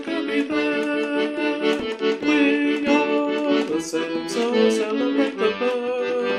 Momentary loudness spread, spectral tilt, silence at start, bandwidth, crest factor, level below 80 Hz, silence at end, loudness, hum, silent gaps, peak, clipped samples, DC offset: 5 LU; -4 dB/octave; 0 s; 11.5 kHz; 16 dB; -62 dBFS; 0 s; -22 LUFS; none; none; -6 dBFS; under 0.1%; under 0.1%